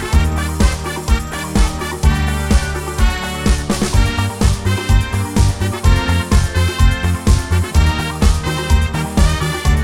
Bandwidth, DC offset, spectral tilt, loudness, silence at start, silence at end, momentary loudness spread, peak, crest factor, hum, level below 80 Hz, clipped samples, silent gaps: 16 kHz; 0.8%; -5 dB/octave; -16 LUFS; 0 s; 0 s; 3 LU; -2 dBFS; 14 dB; none; -18 dBFS; under 0.1%; none